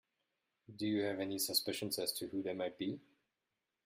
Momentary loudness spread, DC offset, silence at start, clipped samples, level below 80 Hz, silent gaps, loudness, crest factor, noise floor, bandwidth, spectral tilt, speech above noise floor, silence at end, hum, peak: 9 LU; under 0.1%; 0.7 s; under 0.1%; -80 dBFS; none; -38 LUFS; 22 dB; -89 dBFS; 16 kHz; -3 dB/octave; 50 dB; 0.85 s; none; -20 dBFS